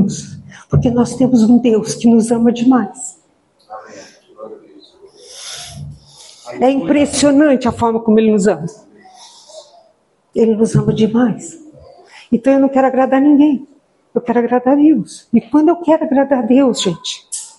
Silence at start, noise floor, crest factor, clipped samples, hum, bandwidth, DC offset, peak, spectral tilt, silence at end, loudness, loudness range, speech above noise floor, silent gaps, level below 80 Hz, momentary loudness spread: 0 s; -56 dBFS; 14 dB; under 0.1%; none; 11.5 kHz; under 0.1%; 0 dBFS; -6 dB/octave; 0.1 s; -13 LUFS; 8 LU; 43 dB; none; -48 dBFS; 18 LU